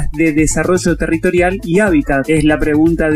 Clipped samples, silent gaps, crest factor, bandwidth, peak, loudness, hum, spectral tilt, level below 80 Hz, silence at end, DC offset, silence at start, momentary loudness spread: under 0.1%; none; 12 dB; 14 kHz; -2 dBFS; -13 LUFS; none; -5.5 dB/octave; -26 dBFS; 0 s; under 0.1%; 0 s; 2 LU